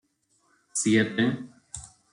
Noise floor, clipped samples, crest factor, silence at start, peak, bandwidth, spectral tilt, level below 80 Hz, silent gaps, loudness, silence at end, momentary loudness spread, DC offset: -69 dBFS; under 0.1%; 18 dB; 0.75 s; -10 dBFS; 11.5 kHz; -4 dB/octave; -62 dBFS; none; -25 LUFS; 0.25 s; 19 LU; under 0.1%